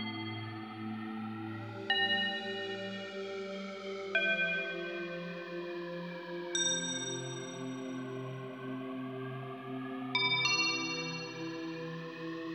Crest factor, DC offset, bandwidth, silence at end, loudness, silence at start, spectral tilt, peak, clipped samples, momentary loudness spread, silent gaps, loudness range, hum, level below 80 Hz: 20 dB; under 0.1%; 17.5 kHz; 0 s; -36 LUFS; 0 s; -2.5 dB/octave; -16 dBFS; under 0.1%; 13 LU; none; 3 LU; none; under -90 dBFS